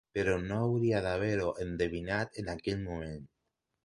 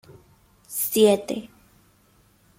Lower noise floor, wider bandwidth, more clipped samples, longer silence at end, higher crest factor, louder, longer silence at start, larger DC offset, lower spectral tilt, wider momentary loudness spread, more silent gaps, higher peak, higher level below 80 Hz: first, -84 dBFS vs -60 dBFS; second, 11.5 kHz vs 16.5 kHz; neither; second, 0.6 s vs 1.1 s; about the same, 16 dB vs 20 dB; second, -33 LUFS vs -22 LUFS; second, 0.15 s vs 0.7 s; neither; first, -7 dB/octave vs -4 dB/octave; second, 9 LU vs 14 LU; neither; second, -18 dBFS vs -6 dBFS; first, -52 dBFS vs -64 dBFS